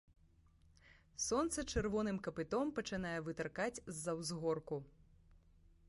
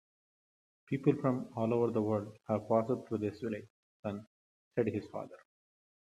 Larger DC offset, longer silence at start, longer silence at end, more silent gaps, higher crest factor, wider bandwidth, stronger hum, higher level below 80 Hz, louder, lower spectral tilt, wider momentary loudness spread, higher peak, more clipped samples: neither; about the same, 0.85 s vs 0.9 s; second, 0.5 s vs 0.65 s; second, none vs 3.70-4.03 s, 4.27-4.71 s; about the same, 18 dB vs 20 dB; about the same, 11.5 kHz vs 12 kHz; neither; first, -60 dBFS vs -76 dBFS; second, -41 LUFS vs -35 LUFS; second, -4.5 dB/octave vs -9 dB/octave; second, 6 LU vs 13 LU; second, -24 dBFS vs -14 dBFS; neither